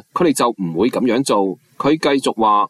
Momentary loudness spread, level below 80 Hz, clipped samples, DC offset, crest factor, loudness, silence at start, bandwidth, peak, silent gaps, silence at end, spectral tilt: 3 LU; -56 dBFS; under 0.1%; under 0.1%; 12 dB; -17 LUFS; 0.15 s; 14.5 kHz; -4 dBFS; none; 0 s; -5 dB/octave